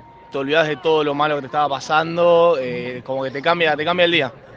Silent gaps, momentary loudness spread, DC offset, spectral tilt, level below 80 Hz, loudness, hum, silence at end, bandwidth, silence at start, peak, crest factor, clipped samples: none; 10 LU; under 0.1%; -5 dB/octave; -60 dBFS; -18 LUFS; none; 0 s; 7.6 kHz; 0.3 s; -2 dBFS; 18 dB; under 0.1%